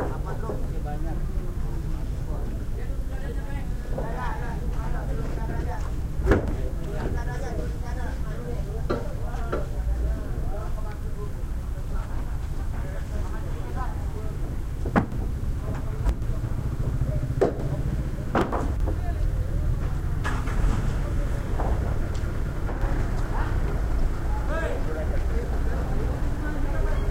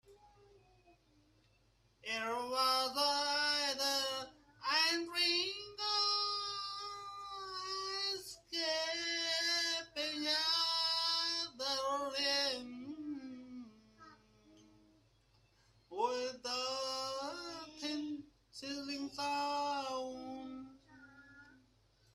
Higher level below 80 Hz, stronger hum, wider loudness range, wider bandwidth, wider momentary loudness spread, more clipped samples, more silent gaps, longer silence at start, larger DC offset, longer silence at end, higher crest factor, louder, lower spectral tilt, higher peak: first, -28 dBFS vs -76 dBFS; neither; second, 5 LU vs 8 LU; about the same, 15.5 kHz vs 15.5 kHz; second, 7 LU vs 15 LU; neither; neither; about the same, 0 s vs 0.1 s; first, 0.7% vs under 0.1%; second, 0 s vs 0.6 s; about the same, 20 dB vs 20 dB; first, -30 LUFS vs -36 LUFS; first, -7.5 dB/octave vs -0.5 dB/octave; first, -4 dBFS vs -18 dBFS